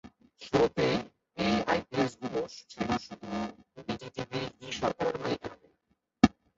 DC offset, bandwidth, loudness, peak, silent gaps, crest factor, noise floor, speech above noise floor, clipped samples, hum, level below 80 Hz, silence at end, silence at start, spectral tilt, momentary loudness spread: under 0.1%; 8 kHz; -32 LUFS; -4 dBFS; none; 28 dB; -76 dBFS; 47 dB; under 0.1%; none; -56 dBFS; 0.3 s; 0.05 s; -5.5 dB/octave; 13 LU